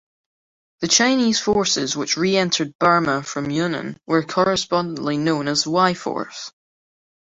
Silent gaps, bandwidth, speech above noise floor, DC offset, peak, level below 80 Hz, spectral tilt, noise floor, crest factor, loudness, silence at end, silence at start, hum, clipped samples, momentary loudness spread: 2.75-2.79 s; 8.2 kHz; over 70 dB; under 0.1%; -2 dBFS; -56 dBFS; -3.5 dB/octave; under -90 dBFS; 18 dB; -19 LUFS; 0.8 s; 0.8 s; none; under 0.1%; 11 LU